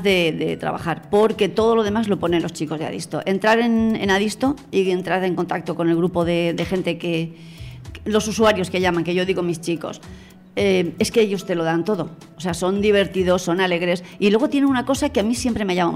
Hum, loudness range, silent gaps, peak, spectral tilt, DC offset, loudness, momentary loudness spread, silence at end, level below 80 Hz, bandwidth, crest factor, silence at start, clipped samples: none; 3 LU; none; -6 dBFS; -5.5 dB/octave; under 0.1%; -20 LUFS; 9 LU; 0 s; -46 dBFS; 16 kHz; 14 dB; 0 s; under 0.1%